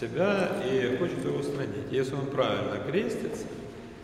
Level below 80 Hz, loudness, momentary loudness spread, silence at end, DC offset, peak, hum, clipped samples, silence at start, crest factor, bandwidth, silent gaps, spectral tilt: -58 dBFS; -30 LUFS; 9 LU; 0 s; under 0.1%; -12 dBFS; none; under 0.1%; 0 s; 16 dB; 14 kHz; none; -6 dB/octave